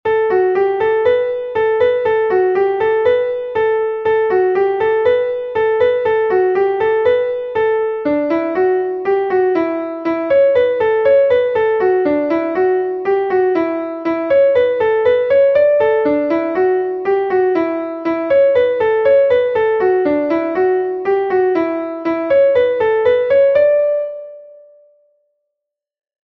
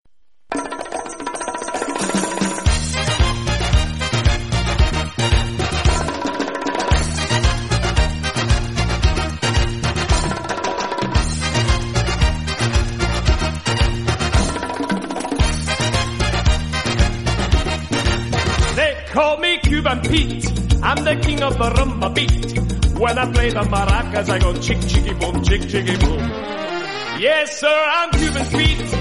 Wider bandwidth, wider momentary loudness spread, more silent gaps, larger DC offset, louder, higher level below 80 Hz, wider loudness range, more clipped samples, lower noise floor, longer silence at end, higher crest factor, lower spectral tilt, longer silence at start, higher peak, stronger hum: second, 5.8 kHz vs 11.5 kHz; about the same, 6 LU vs 6 LU; neither; second, under 0.1% vs 0.6%; first, -15 LUFS vs -19 LUFS; second, -54 dBFS vs -22 dBFS; about the same, 2 LU vs 2 LU; neither; first, -80 dBFS vs -40 dBFS; first, 1.7 s vs 0 s; about the same, 12 dB vs 16 dB; first, -7.5 dB/octave vs -4.5 dB/octave; second, 0.05 s vs 0.5 s; about the same, -4 dBFS vs -2 dBFS; neither